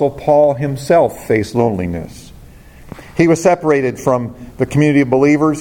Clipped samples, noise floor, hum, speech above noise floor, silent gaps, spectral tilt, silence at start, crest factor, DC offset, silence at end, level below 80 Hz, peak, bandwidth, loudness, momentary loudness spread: under 0.1%; -38 dBFS; none; 25 dB; none; -7 dB/octave; 0 s; 14 dB; under 0.1%; 0 s; -42 dBFS; 0 dBFS; 17 kHz; -14 LUFS; 11 LU